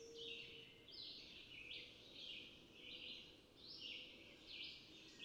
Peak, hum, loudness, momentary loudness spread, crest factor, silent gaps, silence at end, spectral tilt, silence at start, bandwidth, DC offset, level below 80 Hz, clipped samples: -40 dBFS; none; -54 LUFS; 7 LU; 16 dB; none; 0 s; -2.5 dB/octave; 0 s; 16 kHz; under 0.1%; -78 dBFS; under 0.1%